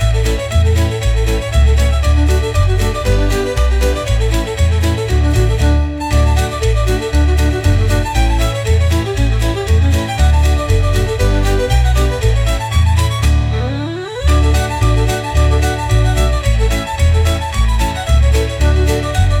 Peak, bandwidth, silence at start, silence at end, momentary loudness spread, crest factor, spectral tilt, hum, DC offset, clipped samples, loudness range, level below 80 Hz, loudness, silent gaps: -2 dBFS; 15.5 kHz; 0 s; 0 s; 3 LU; 10 dB; -5.5 dB/octave; none; under 0.1%; under 0.1%; 1 LU; -16 dBFS; -14 LUFS; none